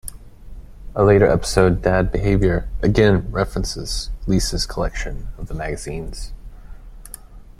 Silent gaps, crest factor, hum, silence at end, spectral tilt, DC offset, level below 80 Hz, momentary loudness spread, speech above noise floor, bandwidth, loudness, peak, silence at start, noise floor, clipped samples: none; 18 dB; none; 0.1 s; -5.5 dB/octave; under 0.1%; -28 dBFS; 20 LU; 20 dB; 14 kHz; -19 LUFS; -2 dBFS; 0.05 s; -39 dBFS; under 0.1%